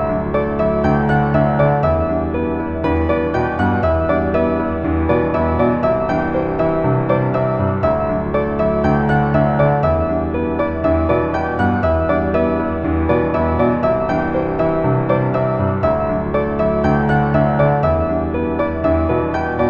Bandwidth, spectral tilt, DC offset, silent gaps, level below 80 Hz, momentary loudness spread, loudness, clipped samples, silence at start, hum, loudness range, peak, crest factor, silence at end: 6.8 kHz; -10 dB/octave; under 0.1%; none; -30 dBFS; 4 LU; -17 LUFS; under 0.1%; 0 s; none; 1 LU; -2 dBFS; 14 dB; 0 s